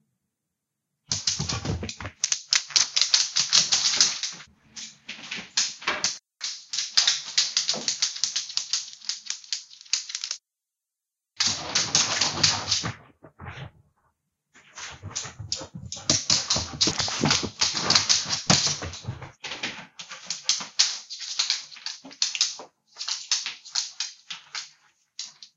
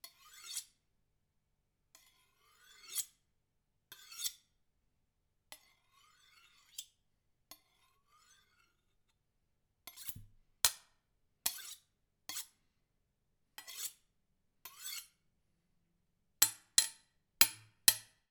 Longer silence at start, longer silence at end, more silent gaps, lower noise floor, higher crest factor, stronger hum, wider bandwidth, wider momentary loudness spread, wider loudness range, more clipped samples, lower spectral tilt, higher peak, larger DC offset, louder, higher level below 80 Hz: first, 1.1 s vs 0.05 s; second, 0.1 s vs 0.3 s; neither; first, -87 dBFS vs -81 dBFS; second, 28 dB vs 38 dB; neither; second, 12.5 kHz vs over 20 kHz; second, 19 LU vs 26 LU; second, 7 LU vs 23 LU; neither; first, -0.5 dB/octave vs 2 dB/octave; first, 0 dBFS vs -4 dBFS; neither; first, -24 LUFS vs -35 LUFS; first, -56 dBFS vs -74 dBFS